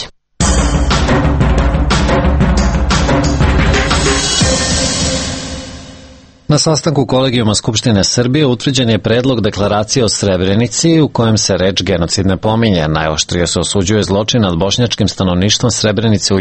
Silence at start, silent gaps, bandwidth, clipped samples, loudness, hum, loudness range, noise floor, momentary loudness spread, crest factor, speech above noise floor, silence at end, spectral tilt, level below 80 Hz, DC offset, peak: 0 s; none; 9 kHz; under 0.1%; -12 LUFS; none; 2 LU; -38 dBFS; 3 LU; 12 dB; 26 dB; 0 s; -4.5 dB/octave; -20 dBFS; under 0.1%; 0 dBFS